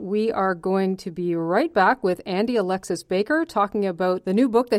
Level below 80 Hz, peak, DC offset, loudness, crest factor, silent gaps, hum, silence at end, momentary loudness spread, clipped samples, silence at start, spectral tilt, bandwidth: -60 dBFS; -6 dBFS; under 0.1%; -23 LUFS; 16 dB; none; none; 0 s; 6 LU; under 0.1%; 0 s; -6 dB/octave; 14.5 kHz